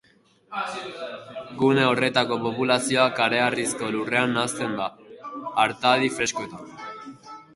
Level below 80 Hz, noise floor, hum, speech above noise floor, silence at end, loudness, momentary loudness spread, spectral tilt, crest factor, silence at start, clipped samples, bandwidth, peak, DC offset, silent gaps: -64 dBFS; -59 dBFS; none; 35 dB; 0.15 s; -23 LUFS; 18 LU; -3.5 dB/octave; 20 dB; 0.5 s; under 0.1%; 11.5 kHz; -4 dBFS; under 0.1%; none